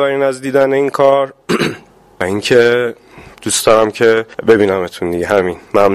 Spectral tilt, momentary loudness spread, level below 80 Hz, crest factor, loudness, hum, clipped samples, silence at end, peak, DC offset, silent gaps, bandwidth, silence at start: -4 dB/octave; 9 LU; -46 dBFS; 14 dB; -13 LUFS; none; under 0.1%; 0 s; 0 dBFS; under 0.1%; none; 15.5 kHz; 0 s